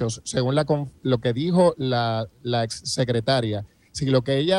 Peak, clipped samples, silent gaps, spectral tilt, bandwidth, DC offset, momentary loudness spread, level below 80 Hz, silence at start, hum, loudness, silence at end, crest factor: -6 dBFS; under 0.1%; none; -5.5 dB/octave; 12 kHz; under 0.1%; 9 LU; -54 dBFS; 0 s; none; -23 LUFS; 0 s; 16 dB